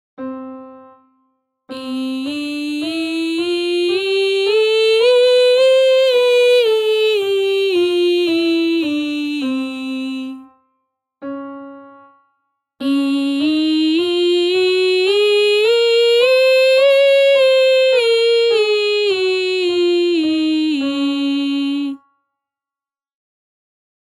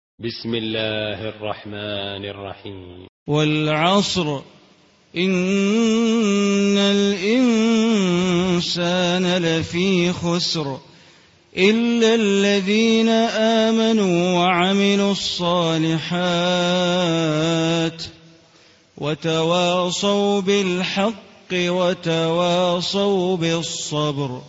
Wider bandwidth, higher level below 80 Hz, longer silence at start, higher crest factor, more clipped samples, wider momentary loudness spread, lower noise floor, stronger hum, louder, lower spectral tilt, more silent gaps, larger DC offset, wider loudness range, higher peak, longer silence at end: first, 13.5 kHz vs 8 kHz; second, -70 dBFS vs -56 dBFS; about the same, 0.2 s vs 0.2 s; about the same, 12 dB vs 16 dB; neither; about the same, 14 LU vs 12 LU; first, under -90 dBFS vs -54 dBFS; neither; first, -15 LUFS vs -19 LUFS; second, -2.5 dB/octave vs -5 dB/octave; second, none vs 3.09-3.26 s; neither; first, 12 LU vs 5 LU; about the same, -4 dBFS vs -4 dBFS; first, 2.1 s vs 0 s